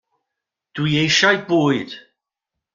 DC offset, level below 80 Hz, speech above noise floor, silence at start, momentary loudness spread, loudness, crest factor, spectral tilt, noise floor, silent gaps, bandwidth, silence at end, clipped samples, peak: under 0.1%; -60 dBFS; 65 dB; 0.75 s; 20 LU; -17 LUFS; 20 dB; -4 dB/octave; -83 dBFS; none; 7.6 kHz; 0.75 s; under 0.1%; 0 dBFS